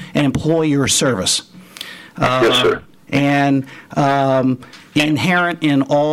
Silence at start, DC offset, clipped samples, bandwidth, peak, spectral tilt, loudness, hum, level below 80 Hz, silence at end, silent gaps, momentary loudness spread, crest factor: 0 s; under 0.1%; under 0.1%; 15.5 kHz; -4 dBFS; -4.5 dB/octave; -16 LUFS; none; -46 dBFS; 0 s; none; 11 LU; 12 dB